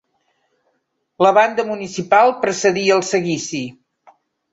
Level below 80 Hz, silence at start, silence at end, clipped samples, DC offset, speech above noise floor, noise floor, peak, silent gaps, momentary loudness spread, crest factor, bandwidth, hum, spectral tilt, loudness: -64 dBFS; 1.2 s; 0.8 s; under 0.1%; under 0.1%; 53 dB; -69 dBFS; -2 dBFS; none; 12 LU; 18 dB; 8 kHz; none; -4 dB/octave; -17 LUFS